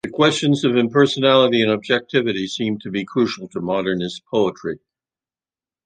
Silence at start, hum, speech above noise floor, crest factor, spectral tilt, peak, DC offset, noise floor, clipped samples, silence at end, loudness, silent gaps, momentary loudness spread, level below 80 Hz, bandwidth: 0.05 s; none; over 71 dB; 18 dB; -5.5 dB/octave; -2 dBFS; under 0.1%; under -90 dBFS; under 0.1%; 1.1 s; -19 LUFS; none; 11 LU; -60 dBFS; 9.6 kHz